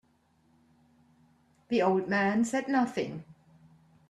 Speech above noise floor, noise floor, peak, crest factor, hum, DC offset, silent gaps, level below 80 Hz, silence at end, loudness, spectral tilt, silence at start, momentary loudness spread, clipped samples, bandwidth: 40 dB; -68 dBFS; -14 dBFS; 18 dB; none; under 0.1%; none; -72 dBFS; 0.8 s; -29 LUFS; -5.5 dB/octave; 1.7 s; 10 LU; under 0.1%; 12 kHz